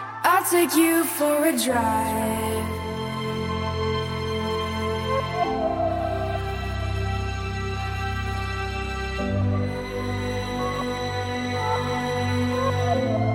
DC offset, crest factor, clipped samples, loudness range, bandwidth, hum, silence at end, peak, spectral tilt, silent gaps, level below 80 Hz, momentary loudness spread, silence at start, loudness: under 0.1%; 18 dB; under 0.1%; 5 LU; 17 kHz; none; 0 s; -6 dBFS; -5 dB/octave; none; -38 dBFS; 8 LU; 0 s; -25 LUFS